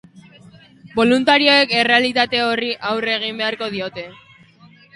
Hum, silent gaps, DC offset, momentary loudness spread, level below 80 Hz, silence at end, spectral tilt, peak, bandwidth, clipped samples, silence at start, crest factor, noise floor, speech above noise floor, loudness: none; none; under 0.1%; 14 LU; -60 dBFS; 0.8 s; -4 dB/octave; 0 dBFS; 11.5 kHz; under 0.1%; 0.15 s; 18 dB; -48 dBFS; 31 dB; -16 LUFS